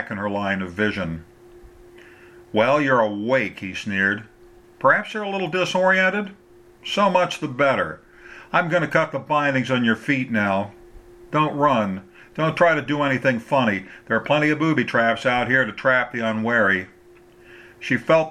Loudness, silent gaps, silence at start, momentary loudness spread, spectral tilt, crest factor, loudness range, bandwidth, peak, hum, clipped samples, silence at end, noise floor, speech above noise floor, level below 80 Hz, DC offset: -21 LUFS; none; 0 s; 10 LU; -6 dB/octave; 20 dB; 3 LU; 12.5 kHz; -2 dBFS; none; under 0.1%; 0 s; -50 dBFS; 29 dB; -56 dBFS; under 0.1%